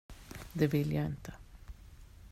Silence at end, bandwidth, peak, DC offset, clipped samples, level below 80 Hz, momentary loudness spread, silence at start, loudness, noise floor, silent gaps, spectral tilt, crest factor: 0.05 s; 15.5 kHz; -14 dBFS; under 0.1%; under 0.1%; -52 dBFS; 23 LU; 0.1 s; -34 LUFS; -54 dBFS; none; -7.5 dB/octave; 22 dB